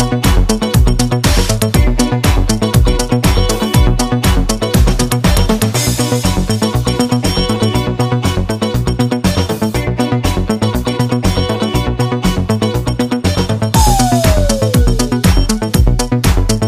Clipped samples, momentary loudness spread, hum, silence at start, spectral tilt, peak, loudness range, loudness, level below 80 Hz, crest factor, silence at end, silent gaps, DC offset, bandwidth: under 0.1%; 3 LU; none; 0 s; -5 dB/octave; 0 dBFS; 2 LU; -13 LUFS; -18 dBFS; 12 dB; 0 s; none; under 0.1%; 15.5 kHz